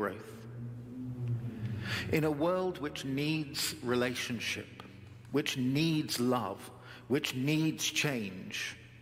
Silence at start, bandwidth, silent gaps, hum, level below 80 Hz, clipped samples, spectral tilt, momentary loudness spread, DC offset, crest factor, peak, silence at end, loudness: 0 s; 16.5 kHz; none; none; -66 dBFS; under 0.1%; -4.5 dB/octave; 15 LU; under 0.1%; 20 dB; -14 dBFS; 0 s; -33 LUFS